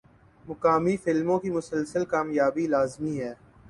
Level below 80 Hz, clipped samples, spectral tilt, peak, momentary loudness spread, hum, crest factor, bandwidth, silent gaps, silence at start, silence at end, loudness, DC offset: -60 dBFS; under 0.1%; -7 dB/octave; -10 dBFS; 8 LU; none; 18 dB; 11.5 kHz; none; 0.45 s; 0.35 s; -26 LUFS; under 0.1%